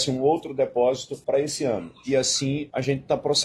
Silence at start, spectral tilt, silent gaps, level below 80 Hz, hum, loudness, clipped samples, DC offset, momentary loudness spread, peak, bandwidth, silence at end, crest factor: 0 s; -4 dB/octave; none; -58 dBFS; none; -24 LUFS; under 0.1%; under 0.1%; 5 LU; -10 dBFS; 13.5 kHz; 0 s; 14 dB